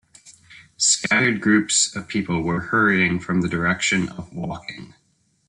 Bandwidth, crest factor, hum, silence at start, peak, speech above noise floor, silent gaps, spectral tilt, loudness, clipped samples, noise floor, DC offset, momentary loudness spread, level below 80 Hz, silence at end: 11 kHz; 18 dB; none; 0.25 s; -4 dBFS; 28 dB; none; -3 dB/octave; -20 LUFS; under 0.1%; -49 dBFS; under 0.1%; 14 LU; -54 dBFS; 0.65 s